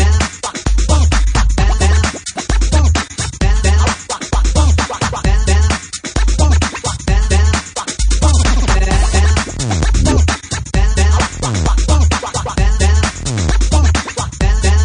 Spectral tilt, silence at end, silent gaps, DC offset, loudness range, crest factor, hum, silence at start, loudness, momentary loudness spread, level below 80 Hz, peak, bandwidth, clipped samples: -4.5 dB/octave; 0 s; none; under 0.1%; 1 LU; 12 dB; none; 0 s; -14 LUFS; 6 LU; -14 dBFS; 0 dBFS; 10.5 kHz; under 0.1%